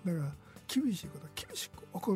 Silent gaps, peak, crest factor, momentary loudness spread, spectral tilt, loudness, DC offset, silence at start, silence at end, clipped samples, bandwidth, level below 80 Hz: none; -20 dBFS; 16 dB; 11 LU; -5.5 dB/octave; -38 LUFS; under 0.1%; 0 s; 0 s; under 0.1%; 16 kHz; -64 dBFS